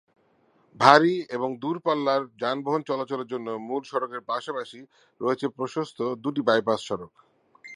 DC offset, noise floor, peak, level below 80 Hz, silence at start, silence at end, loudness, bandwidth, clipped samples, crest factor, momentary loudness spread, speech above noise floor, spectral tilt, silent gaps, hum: under 0.1%; -64 dBFS; 0 dBFS; -72 dBFS; 0.75 s; 0 s; -25 LUFS; 11.5 kHz; under 0.1%; 26 dB; 13 LU; 38 dB; -5 dB/octave; none; none